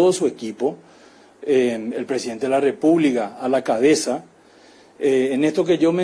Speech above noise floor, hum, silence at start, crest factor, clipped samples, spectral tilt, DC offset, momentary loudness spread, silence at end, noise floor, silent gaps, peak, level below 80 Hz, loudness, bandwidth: 31 dB; none; 0 s; 16 dB; under 0.1%; -5 dB/octave; under 0.1%; 9 LU; 0 s; -50 dBFS; none; -4 dBFS; -64 dBFS; -20 LUFS; 11 kHz